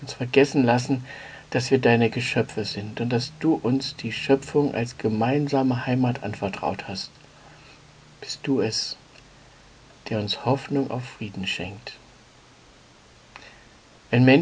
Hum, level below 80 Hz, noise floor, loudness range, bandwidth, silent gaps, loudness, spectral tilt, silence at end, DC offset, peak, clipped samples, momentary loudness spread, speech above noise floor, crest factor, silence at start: none; -58 dBFS; -52 dBFS; 8 LU; 9.8 kHz; none; -24 LUFS; -6 dB/octave; 0 s; under 0.1%; -2 dBFS; under 0.1%; 15 LU; 29 dB; 22 dB; 0 s